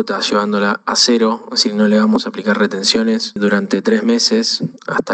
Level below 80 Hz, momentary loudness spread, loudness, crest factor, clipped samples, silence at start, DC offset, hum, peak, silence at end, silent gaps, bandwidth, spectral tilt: -60 dBFS; 5 LU; -14 LUFS; 14 dB; under 0.1%; 0 s; under 0.1%; none; 0 dBFS; 0 s; none; 9 kHz; -3.5 dB/octave